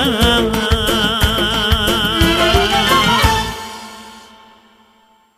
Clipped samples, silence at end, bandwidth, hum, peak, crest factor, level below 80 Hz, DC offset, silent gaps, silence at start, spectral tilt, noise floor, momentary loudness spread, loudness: under 0.1%; 1.2 s; 15.5 kHz; none; 0 dBFS; 14 dB; -24 dBFS; under 0.1%; none; 0 s; -4 dB/octave; -53 dBFS; 16 LU; -13 LUFS